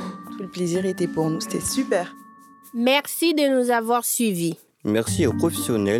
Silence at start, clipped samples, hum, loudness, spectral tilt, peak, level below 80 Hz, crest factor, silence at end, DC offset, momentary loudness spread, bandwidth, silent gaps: 0 s; under 0.1%; none; -22 LUFS; -4.5 dB/octave; -4 dBFS; -56 dBFS; 18 dB; 0 s; under 0.1%; 11 LU; 17.5 kHz; none